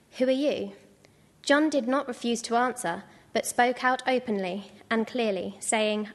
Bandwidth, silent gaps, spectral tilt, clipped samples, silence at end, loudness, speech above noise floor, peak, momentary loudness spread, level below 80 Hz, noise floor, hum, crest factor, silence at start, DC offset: 12.5 kHz; none; -3.5 dB/octave; under 0.1%; 0 s; -27 LUFS; 32 dB; -8 dBFS; 10 LU; -72 dBFS; -59 dBFS; none; 18 dB; 0.15 s; under 0.1%